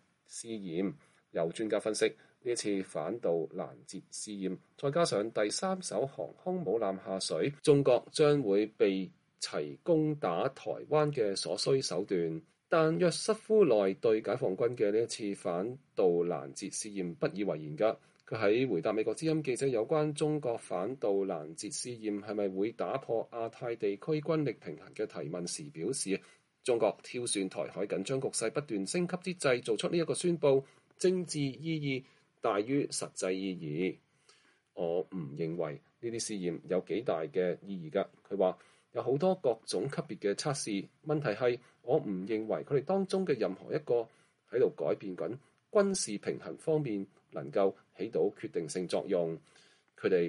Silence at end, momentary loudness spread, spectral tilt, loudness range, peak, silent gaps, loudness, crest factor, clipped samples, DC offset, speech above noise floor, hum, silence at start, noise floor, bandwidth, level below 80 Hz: 0 s; 10 LU; -5 dB/octave; 6 LU; -12 dBFS; none; -33 LUFS; 20 dB; under 0.1%; under 0.1%; 34 dB; none; 0.3 s; -67 dBFS; 11.5 kHz; -78 dBFS